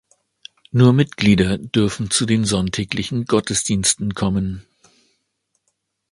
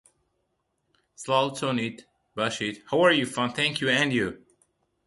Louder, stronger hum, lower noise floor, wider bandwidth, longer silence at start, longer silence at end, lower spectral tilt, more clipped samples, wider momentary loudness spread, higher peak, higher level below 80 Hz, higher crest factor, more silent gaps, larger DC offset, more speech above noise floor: first, -18 LUFS vs -25 LUFS; neither; second, -72 dBFS vs -76 dBFS; about the same, 11.5 kHz vs 11.5 kHz; second, 0.75 s vs 1.2 s; first, 1.5 s vs 0.7 s; about the same, -4.5 dB/octave vs -4 dB/octave; neither; second, 8 LU vs 11 LU; first, 0 dBFS vs -8 dBFS; first, -42 dBFS vs -64 dBFS; about the same, 18 dB vs 20 dB; neither; neither; first, 54 dB vs 50 dB